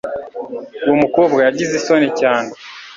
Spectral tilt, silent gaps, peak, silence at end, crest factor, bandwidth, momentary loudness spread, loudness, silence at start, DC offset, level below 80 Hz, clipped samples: -5 dB/octave; none; 0 dBFS; 0 s; 16 dB; 7.6 kHz; 15 LU; -15 LUFS; 0.05 s; under 0.1%; -56 dBFS; under 0.1%